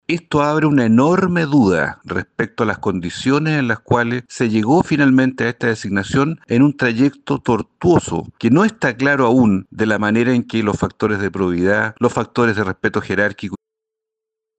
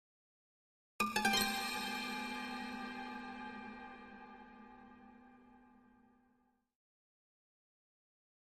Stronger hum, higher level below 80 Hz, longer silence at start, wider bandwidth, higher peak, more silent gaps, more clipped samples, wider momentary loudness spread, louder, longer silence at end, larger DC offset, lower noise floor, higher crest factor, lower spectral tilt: neither; first, -48 dBFS vs -70 dBFS; second, 0.1 s vs 1 s; second, 9 kHz vs 15.5 kHz; first, 0 dBFS vs -18 dBFS; neither; neither; second, 7 LU vs 25 LU; first, -17 LUFS vs -39 LUFS; second, 1.05 s vs 2.75 s; neither; first, -83 dBFS vs -77 dBFS; second, 16 dB vs 26 dB; first, -6.5 dB/octave vs -2 dB/octave